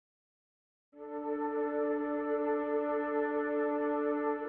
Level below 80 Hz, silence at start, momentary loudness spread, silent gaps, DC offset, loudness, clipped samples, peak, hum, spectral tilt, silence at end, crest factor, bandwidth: -74 dBFS; 0.95 s; 5 LU; none; under 0.1%; -33 LUFS; under 0.1%; -20 dBFS; none; -4 dB/octave; 0 s; 14 dB; 3.9 kHz